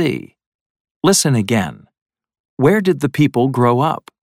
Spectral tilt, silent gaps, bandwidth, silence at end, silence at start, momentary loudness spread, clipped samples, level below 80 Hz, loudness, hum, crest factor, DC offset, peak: -5 dB/octave; 0.46-0.85 s, 0.91-1.00 s, 2.02-2.06 s, 2.40-2.57 s; 16.5 kHz; 0.25 s; 0 s; 6 LU; under 0.1%; -54 dBFS; -16 LUFS; none; 16 dB; under 0.1%; 0 dBFS